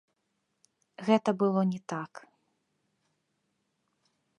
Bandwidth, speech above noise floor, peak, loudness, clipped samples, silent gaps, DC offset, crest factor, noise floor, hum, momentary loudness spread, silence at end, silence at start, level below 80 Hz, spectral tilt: 10.5 kHz; 51 dB; -10 dBFS; -29 LUFS; under 0.1%; none; under 0.1%; 24 dB; -80 dBFS; none; 12 LU; 2.2 s; 1 s; -84 dBFS; -7 dB/octave